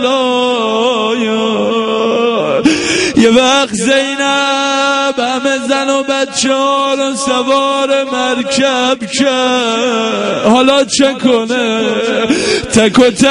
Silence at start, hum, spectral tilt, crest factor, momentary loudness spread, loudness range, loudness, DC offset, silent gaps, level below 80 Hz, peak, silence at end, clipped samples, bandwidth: 0 s; none; -3 dB/octave; 12 dB; 5 LU; 2 LU; -11 LUFS; under 0.1%; none; -46 dBFS; 0 dBFS; 0 s; 0.1%; 11 kHz